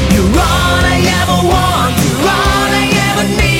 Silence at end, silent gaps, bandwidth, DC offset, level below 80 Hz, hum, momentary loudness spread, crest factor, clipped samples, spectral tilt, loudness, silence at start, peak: 0 s; none; 17 kHz; under 0.1%; -20 dBFS; none; 1 LU; 10 dB; under 0.1%; -4.5 dB/octave; -11 LUFS; 0 s; 0 dBFS